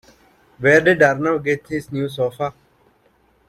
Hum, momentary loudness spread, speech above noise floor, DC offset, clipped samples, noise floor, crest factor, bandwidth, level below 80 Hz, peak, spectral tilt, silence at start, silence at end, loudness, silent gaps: none; 13 LU; 41 dB; under 0.1%; under 0.1%; -59 dBFS; 18 dB; 14 kHz; -56 dBFS; -2 dBFS; -6 dB/octave; 0.6 s; 1 s; -18 LUFS; none